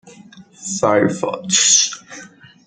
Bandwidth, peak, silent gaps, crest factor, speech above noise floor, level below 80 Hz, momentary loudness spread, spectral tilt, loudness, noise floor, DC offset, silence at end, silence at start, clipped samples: 11 kHz; 0 dBFS; none; 18 dB; 26 dB; -60 dBFS; 22 LU; -1.5 dB/octave; -15 LUFS; -43 dBFS; under 0.1%; 0.4 s; 0.05 s; under 0.1%